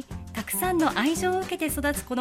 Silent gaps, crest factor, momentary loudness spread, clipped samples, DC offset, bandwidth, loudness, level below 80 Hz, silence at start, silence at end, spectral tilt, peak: none; 18 dB; 7 LU; under 0.1%; under 0.1%; 16.5 kHz; -26 LUFS; -44 dBFS; 0 s; 0 s; -4 dB/octave; -10 dBFS